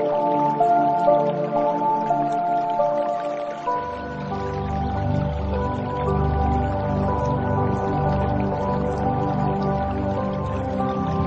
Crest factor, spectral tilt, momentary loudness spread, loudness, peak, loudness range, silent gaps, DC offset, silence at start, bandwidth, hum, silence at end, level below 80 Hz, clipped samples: 16 dB; -9 dB/octave; 7 LU; -23 LUFS; -6 dBFS; 4 LU; none; under 0.1%; 0 s; 8.2 kHz; none; 0 s; -34 dBFS; under 0.1%